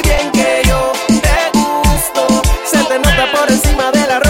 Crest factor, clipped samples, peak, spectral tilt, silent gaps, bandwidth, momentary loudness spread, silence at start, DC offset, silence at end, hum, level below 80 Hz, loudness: 12 dB; under 0.1%; 0 dBFS; -4 dB/octave; none; 17 kHz; 2 LU; 0 s; under 0.1%; 0 s; none; -18 dBFS; -12 LUFS